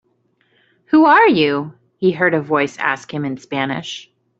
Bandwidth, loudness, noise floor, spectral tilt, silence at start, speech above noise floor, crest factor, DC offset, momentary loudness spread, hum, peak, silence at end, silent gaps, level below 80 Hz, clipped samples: 7.8 kHz; -16 LUFS; -62 dBFS; -6 dB/octave; 0.9 s; 46 dB; 14 dB; under 0.1%; 15 LU; none; -2 dBFS; 0.4 s; none; -62 dBFS; under 0.1%